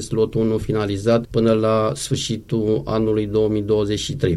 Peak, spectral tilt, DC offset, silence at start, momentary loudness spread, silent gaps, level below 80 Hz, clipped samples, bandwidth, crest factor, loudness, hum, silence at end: -4 dBFS; -6 dB/octave; under 0.1%; 0 s; 5 LU; none; -42 dBFS; under 0.1%; 12.5 kHz; 16 dB; -20 LUFS; none; 0 s